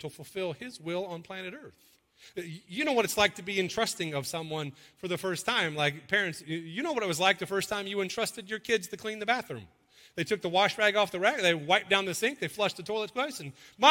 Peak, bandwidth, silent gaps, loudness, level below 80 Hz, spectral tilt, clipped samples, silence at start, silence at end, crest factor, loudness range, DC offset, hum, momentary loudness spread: -4 dBFS; 16.5 kHz; none; -29 LUFS; -68 dBFS; -3 dB/octave; under 0.1%; 0 s; 0 s; 26 dB; 4 LU; under 0.1%; none; 15 LU